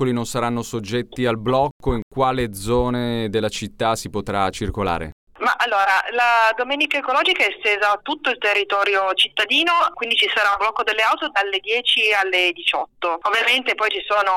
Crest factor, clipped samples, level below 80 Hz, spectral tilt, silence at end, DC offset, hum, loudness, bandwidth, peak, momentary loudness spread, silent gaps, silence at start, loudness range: 14 dB; under 0.1%; -42 dBFS; -3.5 dB/octave; 0 s; under 0.1%; none; -19 LUFS; 17.5 kHz; -6 dBFS; 8 LU; 1.71-1.80 s, 2.02-2.11 s, 5.12-5.27 s; 0 s; 5 LU